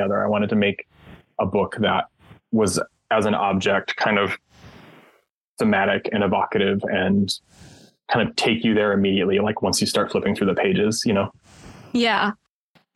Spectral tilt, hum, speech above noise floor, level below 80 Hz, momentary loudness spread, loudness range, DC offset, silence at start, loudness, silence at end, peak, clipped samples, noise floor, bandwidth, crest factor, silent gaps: -4.5 dB/octave; none; 42 dB; -56 dBFS; 7 LU; 3 LU; under 0.1%; 0 s; -21 LUFS; 0.6 s; -4 dBFS; under 0.1%; -63 dBFS; 12.5 kHz; 18 dB; 5.30-5.57 s